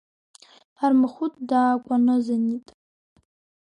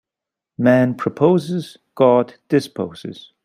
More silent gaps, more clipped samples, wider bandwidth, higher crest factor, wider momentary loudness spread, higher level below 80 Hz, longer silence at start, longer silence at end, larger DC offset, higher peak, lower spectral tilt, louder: neither; neither; second, 9.4 kHz vs 14.5 kHz; about the same, 14 dB vs 16 dB; second, 7 LU vs 15 LU; second, -74 dBFS vs -60 dBFS; first, 0.8 s vs 0.6 s; first, 1.2 s vs 0.25 s; neither; second, -10 dBFS vs -2 dBFS; about the same, -6.5 dB/octave vs -7.5 dB/octave; second, -22 LUFS vs -18 LUFS